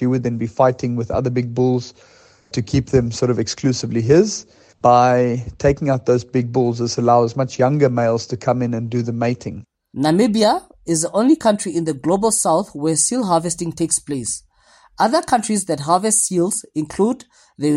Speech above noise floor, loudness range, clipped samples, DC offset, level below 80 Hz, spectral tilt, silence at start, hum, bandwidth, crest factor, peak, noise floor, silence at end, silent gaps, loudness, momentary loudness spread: 35 dB; 3 LU; under 0.1%; under 0.1%; -46 dBFS; -5 dB/octave; 0 s; none; 15 kHz; 16 dB; -2 dBFS; -52 dBFS; 0 s; none; -18 LUFS; 9 LU